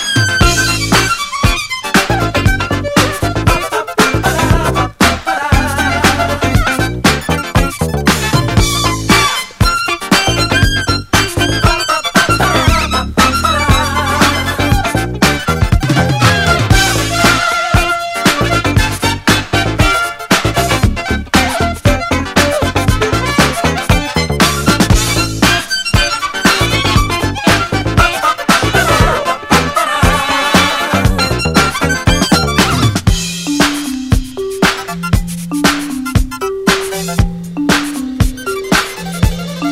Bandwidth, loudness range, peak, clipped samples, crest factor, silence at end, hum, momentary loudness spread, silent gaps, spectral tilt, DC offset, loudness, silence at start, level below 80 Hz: 16.5 kHz; 3 LU; 0 dBFS; 0.2%; 12 dB; 0 s; none; 6 LU; none; -4 dB/octave; under 0.1%; -12 LUFS; 0 s; -22 dBFS